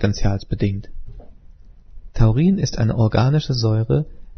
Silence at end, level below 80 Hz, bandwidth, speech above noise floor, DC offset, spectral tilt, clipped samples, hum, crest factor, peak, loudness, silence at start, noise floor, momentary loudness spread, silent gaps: 0.05 s; -30 dBFS; 6.6 kHz; 25 dB; under 0.1%; -7 dB/octave; under 0.1%; none; 18 dB; -2 dBFS; -19 LUFS; 0 s; -43 dBFS; 7 LU; none